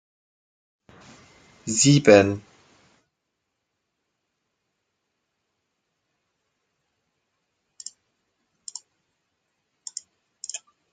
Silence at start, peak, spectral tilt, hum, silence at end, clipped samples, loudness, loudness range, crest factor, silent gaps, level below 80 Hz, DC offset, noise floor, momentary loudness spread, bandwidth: 1.65 s; -2 dBFS; -4.5 dB/octave; none; 0.35 s; under 0.1%; -17 LUFS; 23 LU; 26 dB; none; -66 dBFS; under 0.1%; -80 dBFS; 26 LU; 9.8 kHz